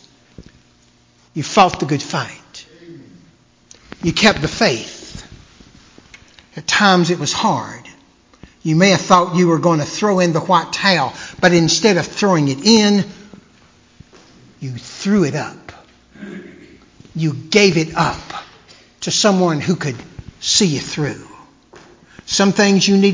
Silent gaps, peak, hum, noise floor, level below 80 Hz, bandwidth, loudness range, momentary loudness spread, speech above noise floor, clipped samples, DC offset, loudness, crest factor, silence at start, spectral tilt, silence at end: none; 0 dBFS; none; -53 dBFS; -48 dBFS; 7.6 kHz; 7 LU; 20 LU; 38 dB; under 0.1%; under 0.1%; -15 LUFS; 18 dB; 0.4 s; -4 dB/octave; 0 s